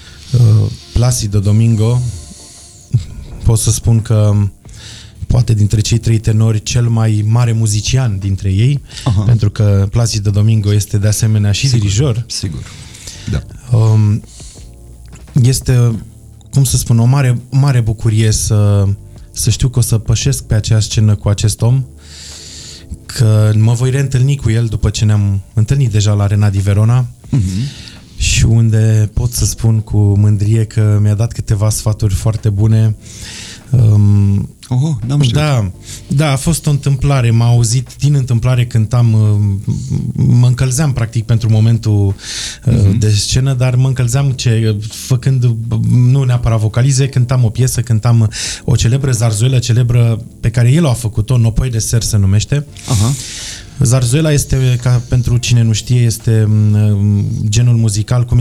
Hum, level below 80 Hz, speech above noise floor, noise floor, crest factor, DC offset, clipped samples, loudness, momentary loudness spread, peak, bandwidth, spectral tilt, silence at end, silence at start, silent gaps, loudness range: none; -28 dBFS; 25 dB; -36 dBFS; 10 dB; 0.1%; under 0.1%; -13 LUFS; 9 LU; 0 dBFS; 14 kHz; -6 dB/octave; 0 s; 0 s; none; 2 LU